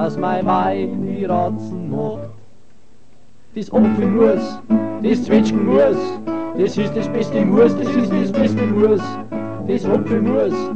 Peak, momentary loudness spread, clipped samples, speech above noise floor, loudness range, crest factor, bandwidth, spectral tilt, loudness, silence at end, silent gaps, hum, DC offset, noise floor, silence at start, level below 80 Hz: -2 dBFS; 11 LU; under 0.1%; 36 dB; 5 LU; 16 dB; 8.2 kHz; -8 dB/octave; -18 LUFS; 0 s; none; none; 2%; -53 dBFS; 0 s; -50 dBFS